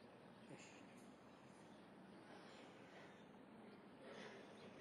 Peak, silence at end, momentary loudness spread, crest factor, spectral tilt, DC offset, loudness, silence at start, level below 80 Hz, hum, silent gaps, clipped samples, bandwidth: -44 dBFS; 0 s; 6 LU; 16 dB; -4.5 dB/octave; under 0.1%; -62 LUFS; 0 s; under -90 dBFS; none; none; under 0.1%; 11.5 kHz